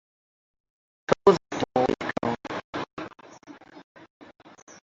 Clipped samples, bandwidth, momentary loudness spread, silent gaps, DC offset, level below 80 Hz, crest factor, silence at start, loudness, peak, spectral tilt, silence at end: under 0.1%; 7.8 kHz; 27 LU; 2.64-2.73 s, 2.93-2.97 s, 3.84-3.95 s, 4.10-4.20 s, 4.62-4.67 s; under 0.1%; -58 dBFS; 24 dB; 1.1 s; -26 LUFS; -4 dBFS; -5.5 dB/octave; 0.15 s